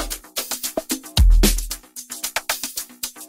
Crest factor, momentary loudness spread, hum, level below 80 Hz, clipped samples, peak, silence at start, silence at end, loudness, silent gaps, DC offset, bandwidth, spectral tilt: 20 dB; 13 LU; none; -22 dBFS; under 0.1%; -2 dBFS; 0 s; 0.05 s; -22 LUFS; none; under 0.1%; 16.5 kHz; -3 dB/octave